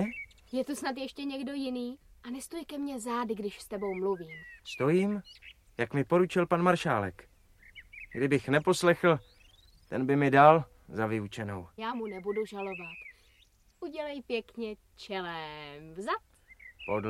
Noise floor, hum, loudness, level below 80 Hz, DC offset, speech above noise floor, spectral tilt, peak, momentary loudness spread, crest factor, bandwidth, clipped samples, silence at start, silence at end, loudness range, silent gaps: -64 dBFS; none; -31 LUFS; -62 dBFS; under 0.1%; 34 dB; -6 dB/octave; -6 dBFS; 18 LU; 26 dB; 15 kHz; under 0.1%; 0 s; 0 s; 12 LU; none